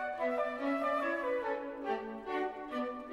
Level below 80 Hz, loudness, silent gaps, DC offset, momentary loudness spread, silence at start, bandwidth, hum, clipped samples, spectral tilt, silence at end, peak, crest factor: -68 dBFS; -36 LUFS; none; under 0.1%; 6 LU; 0 s; 13 kHz; none; under 0.1%; -5 dB/octave; 0 s; -22 dBFS; 14 dB